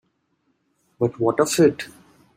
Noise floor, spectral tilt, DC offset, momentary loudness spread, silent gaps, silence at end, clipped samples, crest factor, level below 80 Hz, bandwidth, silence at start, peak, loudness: -69 dBFS; -5 dB/octave; under 0.1%; 16 LU; none; 0.5 s; under 0.1%; 20 dB; -64 dBFS; 16 kHz; 1 s; -4 dBFS; -20 LUFS